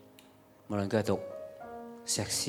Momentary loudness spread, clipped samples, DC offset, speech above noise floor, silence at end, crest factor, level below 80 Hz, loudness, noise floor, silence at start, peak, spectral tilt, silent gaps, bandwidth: 14 LU; under 0.1%; under 0.1%; 27 dB; 0 s; 22 dB; -68 dBFS; -34 LUFS; -59 dBFS; 0 s; -14 dBFS; -3.5 dB/octave; none; 19.5 kHz